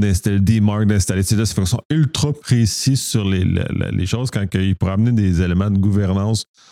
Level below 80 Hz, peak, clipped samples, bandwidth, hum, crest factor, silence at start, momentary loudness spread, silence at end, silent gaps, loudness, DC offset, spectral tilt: -36 dBFS; -4 dBFS; under 0.1%; 15 kHz; none; 12 dB; 0 s; 5 LU; 0.3 s; 1.85-1.90 s; -18 LUFS; under 0.1%; -5.5 dB/octave